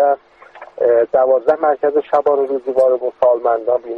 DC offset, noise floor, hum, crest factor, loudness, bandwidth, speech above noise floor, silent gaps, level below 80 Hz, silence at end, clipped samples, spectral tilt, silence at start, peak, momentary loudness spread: under 0.1%; -40 dBFS; none; 14 dB; -15 LUFS; 5.2 kHz; 25 dB; none; -60 dBFS; 0 s; under 0.1%; -7 dB/octave; 0 s; -2 dBFS; 4 LU